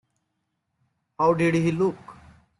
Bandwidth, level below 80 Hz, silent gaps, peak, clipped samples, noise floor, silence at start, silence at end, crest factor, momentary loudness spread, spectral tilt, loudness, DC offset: 11.5 kHz; -60 dBFS; none; -8 dBFS; under 0.1%; -77 dBFS; 1.2 s; 0.5 s; 18 dB; 6 LU; -7.5 dB/octave; -23 LUFS; under 0.1%